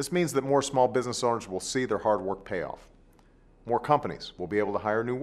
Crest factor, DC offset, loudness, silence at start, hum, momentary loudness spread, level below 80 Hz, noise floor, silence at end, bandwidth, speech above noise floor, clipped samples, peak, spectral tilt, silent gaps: 20 dB; under 0.1%; -28 LUFS; 0 s; none; 11 LU; -58 dBFS; -58 dBFS; 0 s; 13.5 kHz; 30 dB; under 0.1%; -8 dBFS; -5 dB/octave; none